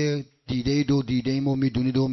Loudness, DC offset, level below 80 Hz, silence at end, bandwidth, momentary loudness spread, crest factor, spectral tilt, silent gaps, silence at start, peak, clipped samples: -25 LUFS; under 0.1%; -48 dBFS; 0 s; 6.2 kHz; 6 LU; 12 dB; -7 dB/octave; none; 0 s; -12 dBFS; under 0.1%